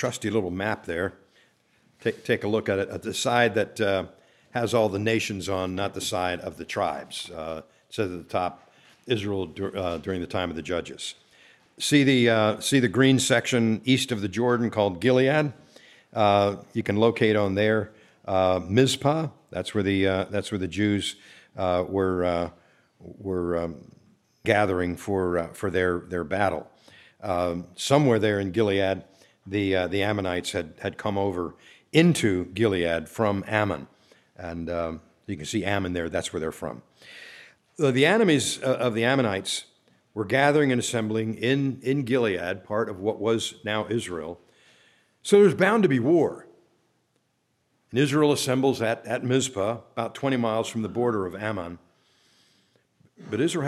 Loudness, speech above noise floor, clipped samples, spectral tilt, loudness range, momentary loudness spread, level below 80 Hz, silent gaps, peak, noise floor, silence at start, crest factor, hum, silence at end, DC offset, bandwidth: -25 LUFS; 48 dB; under 0.1%; -5 dB/octave; 7 LU; 13 LU; -58 dBFS; none; -4 dBFS; -72 dBFS; 0 s; 22 dB; none; 0 s; under 0.1%; 14.5 kHz